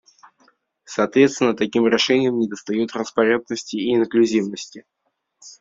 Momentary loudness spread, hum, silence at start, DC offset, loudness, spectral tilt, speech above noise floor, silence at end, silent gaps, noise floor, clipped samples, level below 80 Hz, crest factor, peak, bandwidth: 11 LU; none; 0.9 s; under 0.1%; -20 LUFS; -4.5 dB/octave; 41 dB; 0.1 s; none; -61 dBFS; under 0.1%; -64 dBFS; 18 dB; -2 dBFS; 7.8 kHz